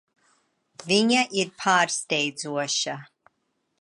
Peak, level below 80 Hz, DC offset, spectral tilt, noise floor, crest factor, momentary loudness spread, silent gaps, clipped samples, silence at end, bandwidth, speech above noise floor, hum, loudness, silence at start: -6 dBFS; -78 dBFS; under 0.1%; -2.5 dB/octave; -75 dBFS; 20 dB; 10 LU; none; under 0.1%; 0.75 s; 11.5 kHz; 51 dB; none; -23 LUFS; 0.8 s